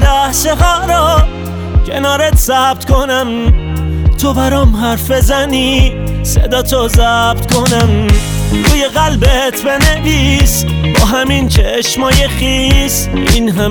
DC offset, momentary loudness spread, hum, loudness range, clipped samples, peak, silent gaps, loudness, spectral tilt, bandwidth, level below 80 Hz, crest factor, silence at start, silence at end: under 0.1%; 4 LU; none; 1 LU; under 0.1%; 0 dBFS; none; -11 LUFS; -4.5 dB/octave; over 20 kHz; -14 dBFS; 10 dB; 0 s; 0 s